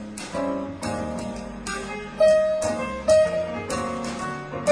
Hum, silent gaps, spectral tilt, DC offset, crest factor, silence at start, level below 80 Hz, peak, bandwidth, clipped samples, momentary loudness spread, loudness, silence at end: none; none; -4.5 dB/octave; under 0.1%; 16 dB; 0 s; -46 dBFS; -8 dBFS; 11 kHz; under 0.1%; 13 LU; -25 LUFS; 0 s